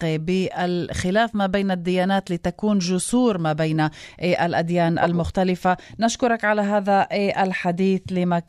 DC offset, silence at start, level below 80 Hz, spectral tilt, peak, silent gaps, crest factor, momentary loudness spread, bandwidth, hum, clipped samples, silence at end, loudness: under 0.1%; 0 s; -48 dBFS; -5.5 dB/octave; -6 dBFS; none; 16 dB; 4 LU; 12.5 kHz; none; under 0.1%; 0.05 s; -21 LUFS